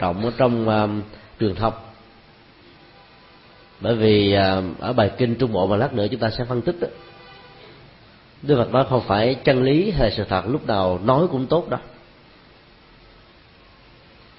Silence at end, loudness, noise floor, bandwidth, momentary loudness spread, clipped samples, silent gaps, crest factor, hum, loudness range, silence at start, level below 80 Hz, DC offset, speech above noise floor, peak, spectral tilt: 2.45 s; -20 LUFS; -50 dBFS; 5.8 kHz; 11 LU; under 0.1%; none; 18 dB; none; 6 LU; 0 s; -42 dBFS; under 0.1%; 30 dB; -4 dBFS; -11.5 dB/octave